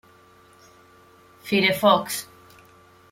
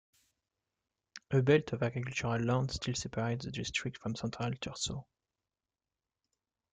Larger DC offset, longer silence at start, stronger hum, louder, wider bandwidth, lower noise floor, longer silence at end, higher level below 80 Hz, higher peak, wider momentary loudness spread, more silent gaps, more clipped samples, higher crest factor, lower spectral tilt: neither; first, 1.45 s vs 1.15 s; neither; first, -21 LUFS vs -34 LUFS; first, 16.5 kHz vs 9.4 kHz; second, -53 dBFS vs under -90 dBFS; second, 0.9 s vs 1.7 s; second, -66 dBFS vs -60 dBFS; first, -4 dBFS vs -14 dBFS; first, 23 LU vs 10 LU; neither; neither; about the same, 22 dB vs 22 dB; second, -3.5 dB/octave vs -5 dB/octave